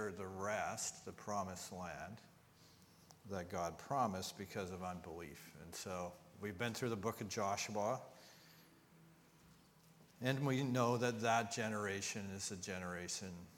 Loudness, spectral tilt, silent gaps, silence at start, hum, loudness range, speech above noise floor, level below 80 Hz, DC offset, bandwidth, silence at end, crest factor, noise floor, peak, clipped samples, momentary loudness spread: -42 LUFS; -4.5 dB/octave; none; 0 s; none; 6 LU; 24 dB; -74 dBFS; under 0.1%; 19 kHz; 0 s; 24 dB; -67 dBFS; -20 dBFS; under 0.1%; 15 LU